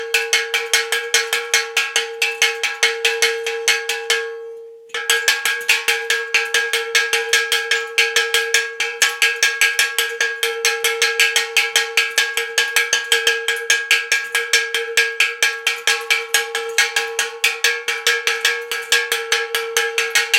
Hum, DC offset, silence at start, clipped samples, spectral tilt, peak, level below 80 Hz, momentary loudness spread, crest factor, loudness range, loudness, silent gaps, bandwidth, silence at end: none; under 0.1%; 0 s; under 0.1%; 4 dB/octave; 0 dBFS; -78 dBFS; 4 LU; 18 dB; 2 LU; -16 LUFS; none; 17 kHz; 0 s